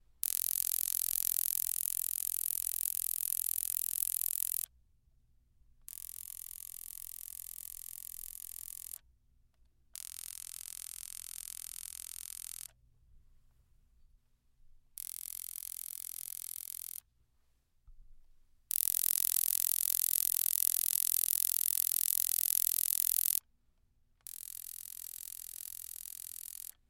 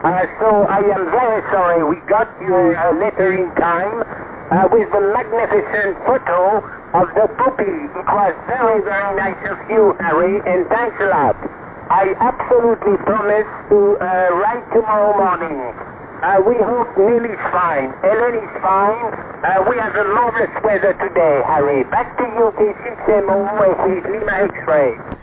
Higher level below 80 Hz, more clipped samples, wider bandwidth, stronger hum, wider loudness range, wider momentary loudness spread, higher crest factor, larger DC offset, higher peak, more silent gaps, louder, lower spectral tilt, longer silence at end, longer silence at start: second, -68 dBFS vs -46 dBFS; neither; first, 17 kHz vs 4 kHz; neither; first, 16 LU vs 1 LU; first, 16 LU vs 6 LU; first, 36 dB vs 12 dB; neither; about the same, -2 dBFS vs -2 dBFS; neither; second, -33 LUFS vs -16 LUFS; second, 3.5 dB/octave vs -10.5 dB/octave; first, 0.2 s vs 0.05 s; first, 0.25 s vs 0 s